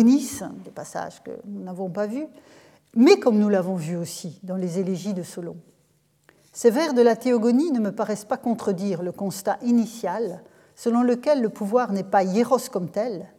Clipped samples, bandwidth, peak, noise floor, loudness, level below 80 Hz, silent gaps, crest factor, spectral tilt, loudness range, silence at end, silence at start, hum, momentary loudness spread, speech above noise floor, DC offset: under 0.1%; 15.5 kHz; -2 dBFS; -64 dBFS; -23 LUFS; -72 dBFS; none; 20 dB; -6 dB/octave; 4 LU; 0.1 s; 0 s; none; 16 LU; 42 dB; under 0.1%